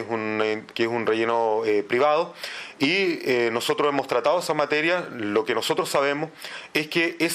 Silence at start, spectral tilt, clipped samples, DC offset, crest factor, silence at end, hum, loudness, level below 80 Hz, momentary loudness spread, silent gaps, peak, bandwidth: 0 s; -4 dB/octave; under 0.1%; under 0.1%; 18 dB; 0 s; none; -23 LUFS; -74 dBFS; 6 LU; none; -6 dBFS; 15.5 kHz